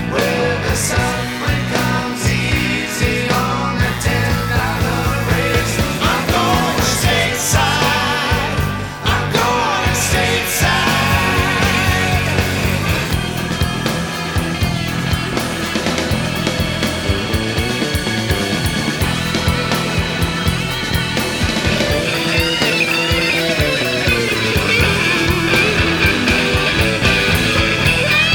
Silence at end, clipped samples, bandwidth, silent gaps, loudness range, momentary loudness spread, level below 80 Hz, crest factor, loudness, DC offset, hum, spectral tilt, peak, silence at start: 0 s; under 0.1%; over 20 kHz; none; 4 LU; 5 LU; -28 dBFS; 16 dB; -16 LUFS; under 0.1%; none; -4 dB/octave; 0 dBFS; 0 s